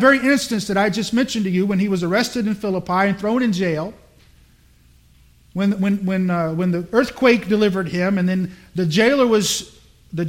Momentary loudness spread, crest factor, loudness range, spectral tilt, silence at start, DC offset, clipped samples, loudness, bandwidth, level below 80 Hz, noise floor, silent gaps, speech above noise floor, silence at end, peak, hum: 7 LU; 18 dB; 5 LU; -5.5 dB/octave; 0 s; under 0.1%; under 0.1%; -19 LUFS; 16.5 kHz; -52 dBFS; -52 dBFS; none; 34 dB; 0 s; -2 dBFS; none